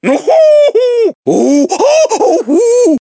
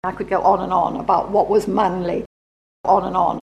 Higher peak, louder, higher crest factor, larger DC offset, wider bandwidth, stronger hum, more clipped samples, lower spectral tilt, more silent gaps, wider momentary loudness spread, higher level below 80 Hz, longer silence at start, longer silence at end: about the same, 0 dBFS vs -2 dBFS; first, -9 LUFS vs -19 LUFS; second, 8 dB vs 16 dB; neither; second, 8 kHz vs 13 kHz; neither; neither; second, -4 dB/octave vs -7 dB/octave; second, 1.15-1.23 s vs 2.26-2.84 s; second, 5 LU vs 8 LU; second, -60 dBFS vs -46 dBFS; about the same, 0.05 s vs 0.05 s; about the same, 0.05 s vs 0.05 s